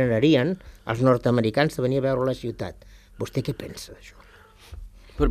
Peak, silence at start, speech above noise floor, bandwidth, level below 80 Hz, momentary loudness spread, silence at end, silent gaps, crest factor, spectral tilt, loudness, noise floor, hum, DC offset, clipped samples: -6 dBFS; 0 s; 27 dB; 15 kHz; -40 dBFS; 21 LU; 0 s; none; 18 dB; -7 dB/octave; -24 LUFS; -51 dBFS; none; under 0.1%; under 0.1%